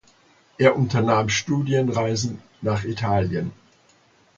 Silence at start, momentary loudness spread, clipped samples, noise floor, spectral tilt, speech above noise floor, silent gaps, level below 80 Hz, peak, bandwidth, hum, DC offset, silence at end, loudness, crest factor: 0.6 s; 10 LU; under 0.1%; -58 dBFS; -5.5 dB/octave; 37 dB; none; -48 dBFS; 0 dBFS; 7.6 kHz; none; under 0.1%; 0.85 s; -22 LUFS; 22 dB